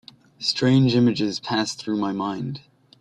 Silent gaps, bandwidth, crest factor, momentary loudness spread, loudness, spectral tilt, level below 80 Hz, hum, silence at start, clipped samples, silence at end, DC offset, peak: none; 11 kHz; 16 dB; 12 LU; -22 LUFS; -5.5 dB/octave; -60 dBFS; none; 0.4 s; under 0.1%; 0.4 s; under 0.1%; -8 dBFS